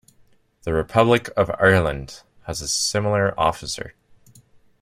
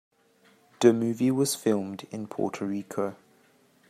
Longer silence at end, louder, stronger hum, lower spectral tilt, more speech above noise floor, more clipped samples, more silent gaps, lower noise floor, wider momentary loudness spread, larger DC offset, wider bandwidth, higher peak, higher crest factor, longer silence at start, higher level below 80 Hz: first, 0.9 s vs 0.75 s; first, -20 LUFS vs -27 LUFS; neither; second, -4 dB/octave vs -5.5 dB/octave; about the same, 36 dB vs 36 dB; neither; neither; second, -57 dBFS vs -62 dBFS; first, 17 LU vs 13 LU; neither; about the same, 15.5 kHz vs 15.5 kHz; first, -2 dBFS vs -6 dBFS; about the same, 20 dB vs 24 dB; second, 0.65 s vs 0.8 s; first, -44 dBFS vs -74 dBFS